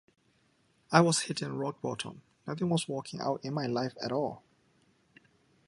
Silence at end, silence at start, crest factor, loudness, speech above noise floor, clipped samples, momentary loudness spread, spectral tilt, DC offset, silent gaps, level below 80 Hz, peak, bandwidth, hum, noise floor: 1.3 s; 0.9 s; 28 dB; -32 LUFS; 39 dB; under 0.1%; 15 LU; -4.5 dB/octave; under 0.1%; none; -72 dBFS; -6 dBFS; 11.5 kHz; none; -70 dBFS